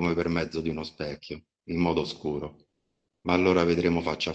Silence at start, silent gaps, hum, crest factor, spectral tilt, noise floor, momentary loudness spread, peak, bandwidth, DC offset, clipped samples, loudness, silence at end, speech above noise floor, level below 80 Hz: 0 s; none; none; 20 dB; -6.5 dB/octave; -79 dBFS; 16 LU; -8 dBFS; 8.2 kHz; under 0.1%; under 0.1%; -27 LUFS; 0 s; 51 dB; -52 dBFS